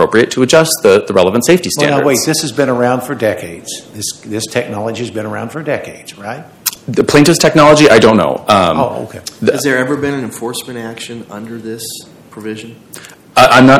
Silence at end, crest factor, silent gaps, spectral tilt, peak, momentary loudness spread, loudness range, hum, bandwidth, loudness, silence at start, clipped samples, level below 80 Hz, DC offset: 0 s; 12 dB; none; -4.5 dB/octave; 0 dBFS; 19 LU; 11 LU; none; over 20 kHz; -11 LUFS; 0 s; 2%; -44 dBFS; under 0.1%